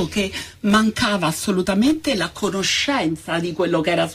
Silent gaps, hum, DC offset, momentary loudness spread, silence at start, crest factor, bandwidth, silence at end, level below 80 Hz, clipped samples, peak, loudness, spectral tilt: none; none; under 0.1%; 6 LU; 0 s; 16 dB; 15.5 kHz; 0 s; -46 dBFS; under 0.1%; -4 dBFS; -20 LUFS; -4 dB/octave